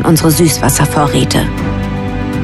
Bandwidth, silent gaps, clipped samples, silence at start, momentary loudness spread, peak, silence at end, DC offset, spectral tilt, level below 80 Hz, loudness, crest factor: 14 kHz; none; under 0.1%; 0 s; 8 LU; 0 dBFS; 0 s; under 0.1%; -5 dB/octave; -26 dBFS; -12 LUFS; 12 dB